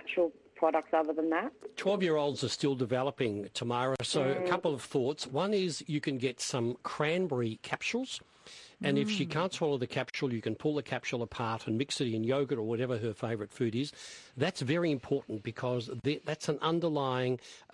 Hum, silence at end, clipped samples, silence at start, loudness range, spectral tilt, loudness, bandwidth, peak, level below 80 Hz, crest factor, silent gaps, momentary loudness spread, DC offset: none; 0.15 s; under 0.1%; 0.05 s; 2 LU; -5 dB/octave; -33 LUFS; 11.5 kHz; -14 dBFS; -72 dBFS; 18 dB; none; 6 LU; under 0.1%